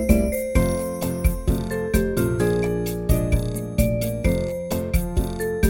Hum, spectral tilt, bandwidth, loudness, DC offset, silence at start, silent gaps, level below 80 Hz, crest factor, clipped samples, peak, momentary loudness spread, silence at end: none; -6.5 dB/octave; 17 kHz; -23 LUFS; under 0.1%; 0 s; none; -26 dBFS; 18 dB; under 0.1%; -4 dBFS; 5 LU; 0 s